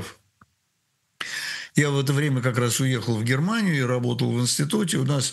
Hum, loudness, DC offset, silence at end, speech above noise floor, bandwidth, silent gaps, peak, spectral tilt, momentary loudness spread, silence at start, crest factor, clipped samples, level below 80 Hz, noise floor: none; -23 LUFS; under 0.1%; 0 s; 50 dB; 12.5 kHz; none; -6 dBFS; -5 dB/octave; 7 LU; 0 s; 18 dB; under 0.1%; -66 dBFS; -72 dBFS